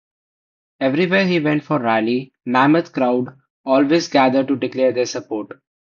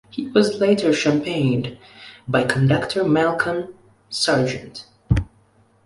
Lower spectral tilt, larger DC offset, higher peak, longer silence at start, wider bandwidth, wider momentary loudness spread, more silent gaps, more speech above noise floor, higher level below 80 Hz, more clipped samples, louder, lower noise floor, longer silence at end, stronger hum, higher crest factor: about the same, -6 dB/octave vs -5.5 dB/octave; neither; about the same, -2 dBFS vs -2 dBFS; first, 0.8 s vs 0.15 s; second, 7.2 kHz vs 11.5 kHz; second, 11 LU vs 19 LU; first, 3.50-3.64 s vs none; first, over 73 dB vs 37 dB; second, -64 dBFS vs -38 dBFS; neither; about the same, -18 LUFS vs -20 LUFS; first, under -90 dBFS vs -57 dBFS; second, 0.45 s vs 0.6 s; neither; about the same, 16 dB vs 18 dB